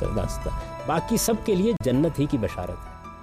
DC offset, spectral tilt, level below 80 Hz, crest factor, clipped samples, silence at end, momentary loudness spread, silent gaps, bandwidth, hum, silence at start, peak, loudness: under 0.1%; -5.5 dB/octave; -36 dBFS; 12 dB; under 0.1%; 0 s; 11 LU; none; 15.5 kHz; none; 0 s; -12 dBFS; -25 LUFS